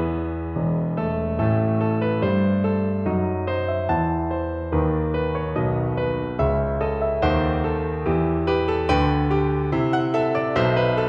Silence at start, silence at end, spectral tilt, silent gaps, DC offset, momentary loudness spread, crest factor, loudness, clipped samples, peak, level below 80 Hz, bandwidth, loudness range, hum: 0 s; 0 s; -9 dB/octave; none; under 0.1%; 4 LU; 16 dB; -22 LUFS; under 0.1%; -6 dBFS; -34 dBFS; 7.4 kHz; 2 LU; none